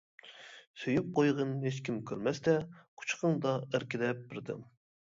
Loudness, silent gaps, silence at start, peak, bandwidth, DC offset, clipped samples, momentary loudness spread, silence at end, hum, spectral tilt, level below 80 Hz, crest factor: -34 LUFS; 0.67-0.74 s, 2.88-2.97 s; 0.25 s; -16 dBFS; 7.8 kHz; under 0.1%; under 0.1%; 19 LU; 0.4 s; none; -6 dB/octave; -72 dBFS; 18 dB